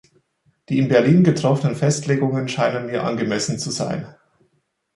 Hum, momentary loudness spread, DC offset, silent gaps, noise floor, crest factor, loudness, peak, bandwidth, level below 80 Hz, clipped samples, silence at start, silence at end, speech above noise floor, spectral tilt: none; 10 LU; under 0.1%; none; -68 dBFS; 18 dB; -19 LUFS; -2 dBFS; 11.5 kHz; -58 dBFS; under 0.1%; 0.7 s; 0.85 s; 49 dB; -6 dB/octave